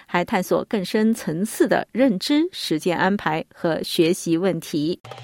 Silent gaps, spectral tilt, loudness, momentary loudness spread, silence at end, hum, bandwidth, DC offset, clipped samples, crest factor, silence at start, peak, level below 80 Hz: 5.00-5.04 s; -5 dB/octave; -22 LUFS; 5 LU; 0 s; none; 17 kHz; under 0.1%; under 0.1%; 18 dB; 0.1 s; -4 dBFS; -60 dBFS